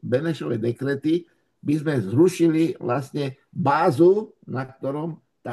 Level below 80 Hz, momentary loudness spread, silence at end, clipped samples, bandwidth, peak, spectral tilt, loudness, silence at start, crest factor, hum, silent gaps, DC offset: -68 dBFS; 14 LU; 0 s; under 0.1%; 12.5 kHz; -6 dBFS; -7.5 dB/octave; -23 LUFS; 0.05 s; 18 dB; none; none; under 0.1%